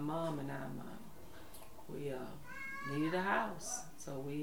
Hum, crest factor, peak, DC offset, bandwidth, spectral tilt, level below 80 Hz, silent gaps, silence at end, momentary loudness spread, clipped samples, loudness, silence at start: none; 22 dB; -20 dBFS; 0.4%; over 20 kHz; -4.5 dB/octave; -64 dBFS; none; 0 s; 19 LU; under 0.1%; -41 LUFS; 0 s